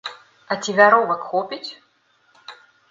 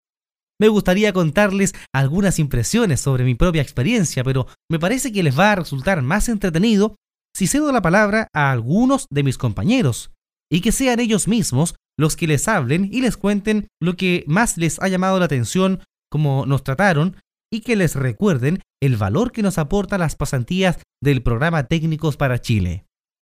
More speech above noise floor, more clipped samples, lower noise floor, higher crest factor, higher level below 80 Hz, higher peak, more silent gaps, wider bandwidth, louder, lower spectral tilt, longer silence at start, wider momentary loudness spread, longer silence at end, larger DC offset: second, 43 dB vs over 72 dB; neither; second, -61 dBFS vs under -90 dBFS; about the same, 22 dB vs 18 dB; second, -72 dBFS vs -34 dBFS; about the same, 0 dBFS vs 0 dBFS; second, none vs 4.64-4.68 s, 6.98-7.02 s, 10.18-10.22 s; second, 7.8 kHz vs 16 kHz; about the same, -18 LUFS vs -19 LUFS; second, -3.5 dB/octave vs -5.5 dB/octave; second, 0.05 s vs 0.6 s; first, 20 LU vs 6 LU; about the same, 0.4 s vs 0.4 s; neither